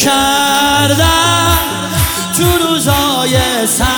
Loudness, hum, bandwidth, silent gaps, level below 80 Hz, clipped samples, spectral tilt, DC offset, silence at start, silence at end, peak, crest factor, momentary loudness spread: -11 LUFS; none; 19.5 kHz; none; -26 dBFS; under 0.1%; -3 dB/octave; under 0.1%; 0 s; 0 s; 0 dBFS; 12 dB; 4 LU